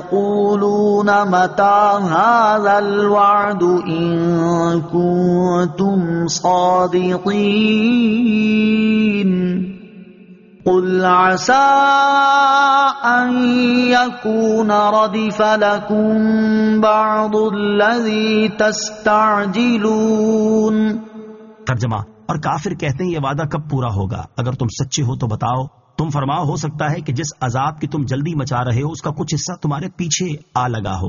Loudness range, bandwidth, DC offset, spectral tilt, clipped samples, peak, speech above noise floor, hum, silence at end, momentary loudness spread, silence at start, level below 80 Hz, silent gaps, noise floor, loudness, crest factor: 7 LU; 7.4 kHz; under 0.1%; -5 dB/octave; under 0.1%; -2 dBFS; 27 dB; none; 0 s; 9 LU; 0 s; -48 dBFS; none; -42 dBFS; -16 LUFS; 14 dB